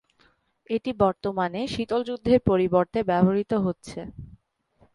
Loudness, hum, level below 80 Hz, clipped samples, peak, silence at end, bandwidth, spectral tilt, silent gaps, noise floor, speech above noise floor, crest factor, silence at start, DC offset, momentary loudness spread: -24 LUFS; none; -50 dBFS; under 0.1%; -6 dBFS; 0.7 s; 11 kHz; -7.5 dB/octave; none; -64 dBFS; 40 dB; 20 dB; 0.7 s; under 0.1%; 15 LU